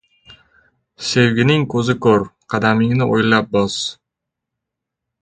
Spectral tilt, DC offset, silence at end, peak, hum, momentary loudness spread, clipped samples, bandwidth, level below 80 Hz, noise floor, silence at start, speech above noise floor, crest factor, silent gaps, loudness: -5.5 dB/octave; under 0.1%; 1.3 s; 0 dBFS; none; 9 LU; under 0.1%; 9.4 kHz; -50 dBFS; -81 dBFS; 0.3 s; 66 dB; 18 dB; none; -16 LUFS